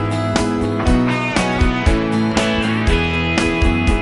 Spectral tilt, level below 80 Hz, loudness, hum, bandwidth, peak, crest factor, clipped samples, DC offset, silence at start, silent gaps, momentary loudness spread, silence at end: -5.5 dB/octave; -22 dBFS; -17 LUFS; none; 11.5 kHz; -2 dBFS; 14 dB; under 0.1%; under 0.1%; 0 s; none; 2 LU; 0 s